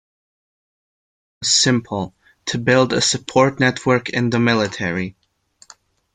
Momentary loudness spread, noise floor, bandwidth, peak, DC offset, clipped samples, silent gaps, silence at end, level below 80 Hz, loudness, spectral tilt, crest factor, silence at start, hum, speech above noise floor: 12 LU; -54 dBFS; 9.6 kHz; -2 dBFS; under 0.1%; under 0.1%; none; 1.05 s; -54 dBFS; -18 LUFS; -3.5 dB/octave; 18 dB; 1.4 s; none; 37 dB